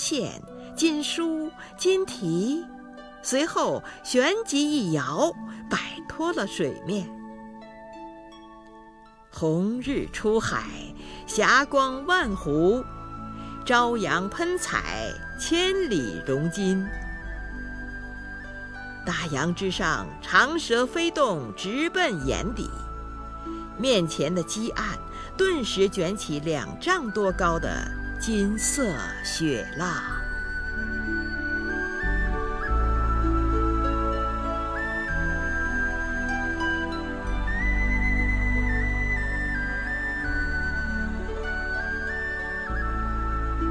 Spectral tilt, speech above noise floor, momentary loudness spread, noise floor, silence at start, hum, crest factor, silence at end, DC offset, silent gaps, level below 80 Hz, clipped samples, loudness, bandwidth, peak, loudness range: -4 dB/octave; 25 dB; 14 LU; -50 dBFS; 0 s; none; 20 dB; 0 s; under 0.1%; none; -34 dBFS; under 0.1%; -26 LUFS; 11 kHz; -6 dBFS; 6 LU